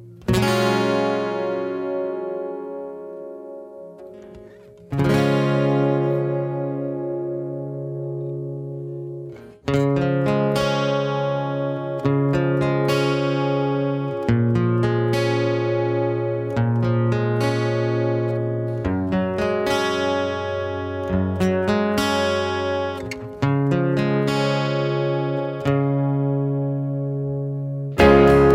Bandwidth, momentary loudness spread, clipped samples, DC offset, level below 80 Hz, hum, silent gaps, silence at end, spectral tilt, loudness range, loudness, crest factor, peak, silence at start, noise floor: 14 kHz; 11 LU; under 0.1%; under 0.1%; -42 dBFS; none; none; 0 s; -7 dB/octave; 6 LU; -22 LUFS; 20 dB; -2 dBFS; 0 s; -44 dBFS